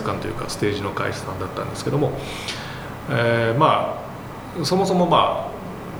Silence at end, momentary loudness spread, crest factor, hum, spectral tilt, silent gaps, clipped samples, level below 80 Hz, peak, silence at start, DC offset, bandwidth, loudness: 0 s; 15 LU; 20 dB; none; -5.5 dB/octave; none; under 0.1%; -46 dBFS; -2 dBFS; 0 s; under 0.1%; over 20 kHz; -22 LUFS